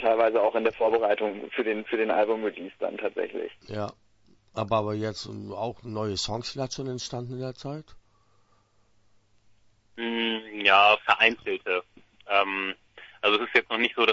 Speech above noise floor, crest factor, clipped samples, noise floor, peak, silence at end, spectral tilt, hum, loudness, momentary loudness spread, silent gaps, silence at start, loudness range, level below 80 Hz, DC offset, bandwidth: 39 dB; 24 dB; under 0.1%; -65 dBFS; -4 dBFS; 0 s; -4 dB/octave; none; -26 LUFS; 15 LU; none; 0 s; 12 LU; -62 dBFS; under 0.1%; 8 kHz